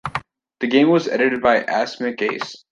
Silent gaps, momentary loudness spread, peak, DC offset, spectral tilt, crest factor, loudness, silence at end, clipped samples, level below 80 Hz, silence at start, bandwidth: none; 13 LU; -2 dBFS; under 0.1%; -5.5 dB/octave; 18 dB; -19 LUFS; 0.15 s; under 0.1%; -56 dBFS; 0.05 s; 10.5 kHz